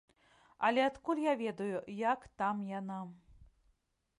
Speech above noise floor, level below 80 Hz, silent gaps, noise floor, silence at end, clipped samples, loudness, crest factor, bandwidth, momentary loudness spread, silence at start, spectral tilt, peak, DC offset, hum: 42 dB; -70 dBFS; none; -77 dBFS; 0.75 s; under 0.1%; -35 LUFS; 20 dB; 11 kHz; 11 LU; 0.6 s; -6 dB/octave; -18 dBFS; under 0.1%; none